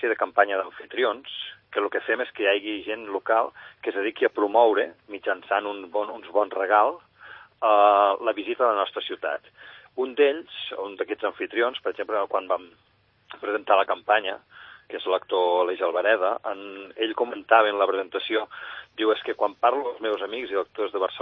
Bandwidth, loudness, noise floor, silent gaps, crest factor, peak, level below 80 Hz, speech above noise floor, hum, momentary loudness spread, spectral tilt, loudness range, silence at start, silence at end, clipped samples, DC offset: 5.4 kHz; -25 LUFS; -47 dBFS; none; 22 dB; -4 dBFS; -74 dBFS; 23 dB; none; 13 LU; -6 dB/octave; 4 LU; 0 s; 0 s; under 0.1%; under 0.1%